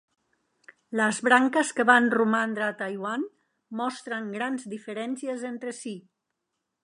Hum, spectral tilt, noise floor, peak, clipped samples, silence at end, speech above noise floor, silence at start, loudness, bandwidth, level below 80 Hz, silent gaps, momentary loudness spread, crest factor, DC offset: none; -4 dB/octave; -82 dBFS; -4 dBFS; under 0.1%; 0.85 s; 56 dB; 0.9 s; -26 LUFS; 11 kHz; -82 dBFS; none; 16 LU; 24 dB; under 0.1%